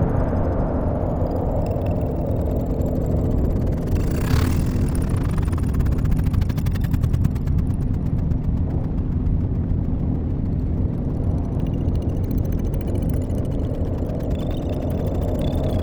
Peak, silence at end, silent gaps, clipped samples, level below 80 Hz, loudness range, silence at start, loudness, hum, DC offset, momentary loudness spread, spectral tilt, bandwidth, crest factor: -6 dBFS; 0 s; none; under 0.1%; -26 dBFS; 2 LU; 0 s; -23 LUFS; none; under 0.1%; 3 LU; -8.5 dB/octave; over 20 kHz; 16 dB